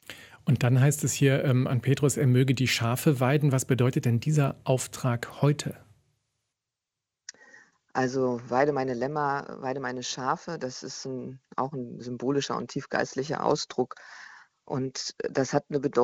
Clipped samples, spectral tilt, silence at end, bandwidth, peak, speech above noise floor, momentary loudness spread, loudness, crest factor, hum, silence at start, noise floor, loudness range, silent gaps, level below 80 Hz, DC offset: under 0.1%; -5.5 dB/octave; 0 s; 16.5 kHz; -10 dBFS; 61 dB; 13 LU; -27 LUFS; 18 dB; none; 0.1 s; -88 dBFS; 8 LU; none; -64 dBFS; under 0.1%